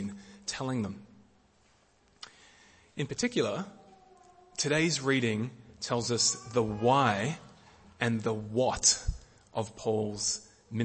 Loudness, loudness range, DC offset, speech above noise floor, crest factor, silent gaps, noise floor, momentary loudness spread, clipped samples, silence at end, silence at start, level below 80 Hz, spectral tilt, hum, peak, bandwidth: -30 LUFS; 9 LU; under 0.1%; 36 dB; 22 dB; none; -66 dBFS; 18 LU; under 0.1%; 0 s; 0 s; -52 dBFS; -3.5 dB/octave; none; -10 dBFS; 8.8 kHz